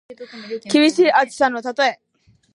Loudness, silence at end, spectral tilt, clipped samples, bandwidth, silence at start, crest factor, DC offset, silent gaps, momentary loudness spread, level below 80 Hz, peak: -17 LUFS; 0.6 s; -3 dB/octave; under 0.1%; 11 kHz; 0.1 s; 16 dB; under 0.1%; none; 18 LU; -68 dBFS; -2 dBFS